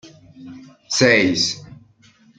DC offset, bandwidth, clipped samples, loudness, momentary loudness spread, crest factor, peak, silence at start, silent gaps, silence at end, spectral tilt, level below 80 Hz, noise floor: under 0.1%; 9.4 kHz; under 0.1%; -16 LUFS; 19 LU; 22 dB; 0 dBFS; 0.05 s; none; 0.65 s; -3 dB/octave; -58 dBFS; -53 dBFS